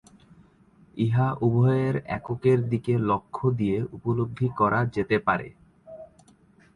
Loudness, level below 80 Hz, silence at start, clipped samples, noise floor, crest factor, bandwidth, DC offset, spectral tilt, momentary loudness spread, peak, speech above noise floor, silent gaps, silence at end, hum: -25 LUFS; -54 dBFS; 0.95 s; under 0.1%; -57 dBFS; 18 dB; 9.6 kHz; under 0.1%; -9.5 dB/octave; 9 LU; -8 dBFS; 33 dB; none; 0.7 s; none